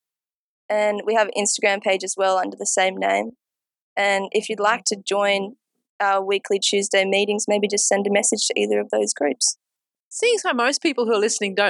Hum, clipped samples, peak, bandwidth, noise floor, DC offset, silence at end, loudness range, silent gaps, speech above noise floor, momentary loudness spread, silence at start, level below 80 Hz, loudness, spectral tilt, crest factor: none; under 0.1%; -6 dBFS; 12 kHz; under -90 dBFS; under 0.1%; 0 s; 2 LU; 3.81-3.96 s, 5.89-6.00 s, 10.00-10.11 s; over 69 dB; 4 LU; 0.7 s; -82 dBFS; -20 LUFS; -2 dB/octave; 16 dB